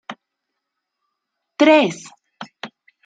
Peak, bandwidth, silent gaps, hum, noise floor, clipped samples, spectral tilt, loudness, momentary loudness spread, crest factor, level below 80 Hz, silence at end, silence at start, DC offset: -2 dBFS; 9.2 kHz; none; none; -79 dBFS; under 0.1%; -4.5 dB/octave; -15 LUFS; 25 LU; 20 dB; -76 dBFS; 0.4 s; 0.1 s; under 0.1%